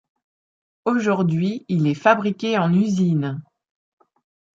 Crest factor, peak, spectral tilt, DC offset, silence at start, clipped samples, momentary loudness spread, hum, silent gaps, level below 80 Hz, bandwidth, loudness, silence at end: 20 dB; -2 dBFS; -7.5 dB/octave; under 0.1%; 0.85 s; under 0.1%; 7 LU; none; none; -66 dBFS; 7.6 kHz; -20 LUFS; 1.15 s